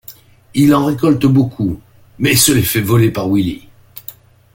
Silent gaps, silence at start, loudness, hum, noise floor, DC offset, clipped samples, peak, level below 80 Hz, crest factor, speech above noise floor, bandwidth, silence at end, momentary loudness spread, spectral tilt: none; 0.1 s; -13 LUFS; none; -40 dBFS; under 0.1%; under 0.1%; 0 dBFS; -42 dBFS; 14 dB; 27 dB; 17 kHz; 0.45 s; 21 LU; -5 dB/octave